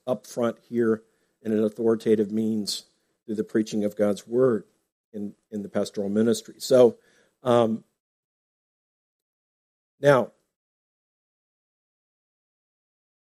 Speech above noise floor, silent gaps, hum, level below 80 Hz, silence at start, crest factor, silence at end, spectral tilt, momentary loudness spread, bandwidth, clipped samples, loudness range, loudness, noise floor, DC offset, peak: over 67 dB; 4.92-5.12 s, 8.00-9.98 s; none; -74 dBFS; 0.05 s; 22 dB; 3.1 s; -6 dB/octave; 14 LU; 15 kHz; under 0.1%; 5 LU; -25 LUFS; under -90 dBFS; under 0.1%; -4 dBFS